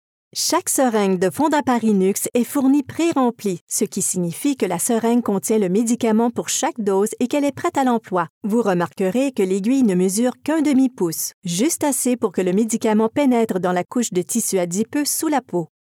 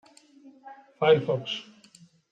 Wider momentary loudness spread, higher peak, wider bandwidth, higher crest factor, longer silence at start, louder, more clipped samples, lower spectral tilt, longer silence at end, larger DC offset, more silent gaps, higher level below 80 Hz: second, 4 LU vs 15 LU; first, -6 dBFS vs -10 dBFS; first, 17.5 kHz vs 9 kHz; second, 14 dB vs 20 dB; about the same, 0.35 s vs 0.45 s; first, -19 LUFS vs -25 LUFS; neither; second, -4.5 dB/octave vs -6 dB/octave; second, 0.25 s vs 0.7 s; neither; first, 3.61-3.67 s, 8.30-8.41 s, 11.34-11.42 s vs none; about the same, -72 dBFS vs -76 dBFS